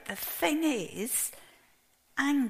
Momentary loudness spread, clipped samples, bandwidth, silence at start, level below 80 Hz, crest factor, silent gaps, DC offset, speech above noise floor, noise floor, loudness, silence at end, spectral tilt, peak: 7 LU; under 0.1%; 15.5 kHz; 0 s; -68 dBFS; 18 dB; none; under 0.1%; 37 dB; -66 dBFS; -31 LUFS; 0 s; -2.5 dB/octave; -14 dBFS